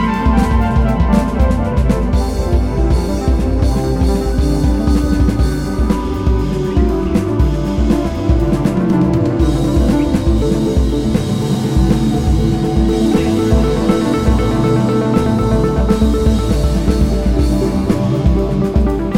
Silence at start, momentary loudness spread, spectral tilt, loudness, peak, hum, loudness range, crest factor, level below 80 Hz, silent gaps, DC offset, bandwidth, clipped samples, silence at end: 0 s; 3 LU; -7.5 dB/octave; -15 LUFS; 0 dBFS; none; 2 LU; 12 dB; -18 dBFS; none; under 0.1%; 15 kHz; under 0.1%; 0 s